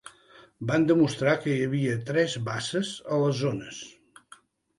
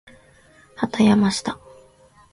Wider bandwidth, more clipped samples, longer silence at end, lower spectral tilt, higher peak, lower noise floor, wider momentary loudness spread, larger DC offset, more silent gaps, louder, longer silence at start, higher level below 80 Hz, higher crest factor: about the same, 11.5 kHz vs 11.5 kHz; neither; about the same, 0.85 s vs 0.8 s; about the same, -6 dB/octave vs -5.5 dB/octave; second, -10 dBFS vs -4 dBFS; about the same, -56 dBFS vs -53 dBFS; about the same, 14 LU vs 15 LU; neither; neither; second, -26 LUFS vs -20 LUFS; second, 0.05 s vs 0.8 s; second, -64 dBFS vs -54 dBFS; about the same, 18 dB vs 20 dB